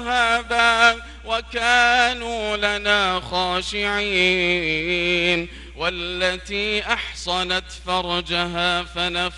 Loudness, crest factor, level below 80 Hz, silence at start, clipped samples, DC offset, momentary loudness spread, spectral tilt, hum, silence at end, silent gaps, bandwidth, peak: -20 LUFS; 20 dB; -40 dBFS; 0 s; under 0.1%; under 0.1%; 9 LU; -3 dB/octave; none; 0 s; none; 12 kHz; -2 dBFS